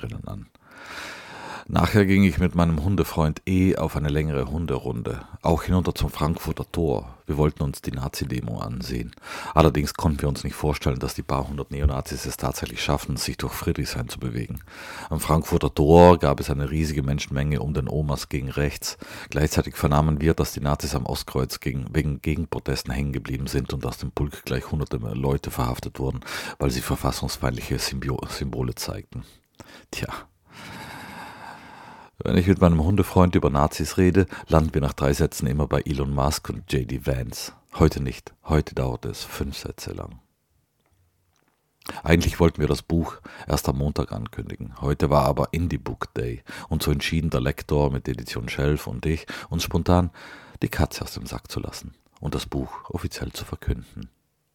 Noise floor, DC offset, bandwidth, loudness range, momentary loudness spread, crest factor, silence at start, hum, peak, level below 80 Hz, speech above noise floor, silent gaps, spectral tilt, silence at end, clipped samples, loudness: -69 dBFS; under 0.1%; 18 kHz; 9 LU; 15 LU; 24 dB; 0 s; none; 0 dBFS; -34 dBFS; 45 dB; none; -6 dB/octave; 0.5 s; under 0.1%; -24 LUFS